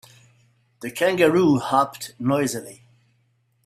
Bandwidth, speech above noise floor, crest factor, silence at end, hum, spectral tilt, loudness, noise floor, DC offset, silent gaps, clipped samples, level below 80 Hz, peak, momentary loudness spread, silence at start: 15.5 kHz; 45 dB; 20 dB; 0.9 s; none; -5.5 dB/octave; -21 LUFS; -66 dBFS; under 0.1%; none; under 0.1%; -62 dBFS; -4 dBFS; 16 LU; 0.8 s